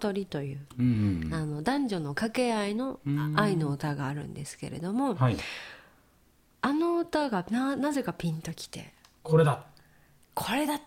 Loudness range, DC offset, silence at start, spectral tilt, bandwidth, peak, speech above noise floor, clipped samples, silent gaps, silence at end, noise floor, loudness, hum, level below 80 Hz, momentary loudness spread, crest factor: 2 LU; under 0.1%; 0 s; -6.5 dB/octave; 16.5 kHz; -10 dBFS; 35 dB; under 0.1%; none; 0 s; -64 dBFS; -30 LUFS; none; -56 dBFS; 12 LU; 20 dB